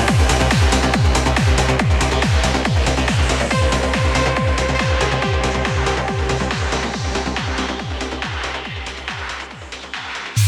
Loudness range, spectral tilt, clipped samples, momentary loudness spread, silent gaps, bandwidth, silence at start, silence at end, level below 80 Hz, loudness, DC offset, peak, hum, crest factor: 7 LU; -4.5 dB/octave; under 0.1%; 11 LU; none; 14 kHz; 0 s; 0 s; -24 dBFS; -18 LUFS; under 0.1%; -2 dBFS; none; 14 dB